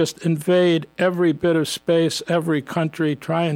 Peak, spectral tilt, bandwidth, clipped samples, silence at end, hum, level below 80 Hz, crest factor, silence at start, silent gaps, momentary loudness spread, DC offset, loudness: -8 dBFS; -5.5 dB/octave; 16.5 kHz; under 0.1%; 0 s; none; -60 dBFS; 12 dB; 0 s; none; 5 LU; under 0.1%; -20 LUFS